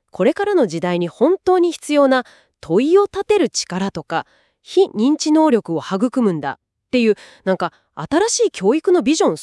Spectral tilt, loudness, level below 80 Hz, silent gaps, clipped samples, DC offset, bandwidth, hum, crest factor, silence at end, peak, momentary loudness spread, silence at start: -4.5 dB/octave; -17 LUFS; -58 dBFS; none; under 0.1%; under 0.1%; 12 kHz; none; 14 dB; 0 s; -4 dBFS; 9 LU; 0.2 s